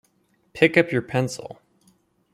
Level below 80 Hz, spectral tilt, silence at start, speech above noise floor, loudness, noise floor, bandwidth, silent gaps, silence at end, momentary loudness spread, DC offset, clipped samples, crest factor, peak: -62 dBFS; -5.5 dB/octave; 0.55 s; 44 dB; -21 LUFS; -66 dBFS; 14.5 kHz; none; 0.8 s; 23 LU; under 0.1%; under 0.1%; 22 dB; -2 dBFS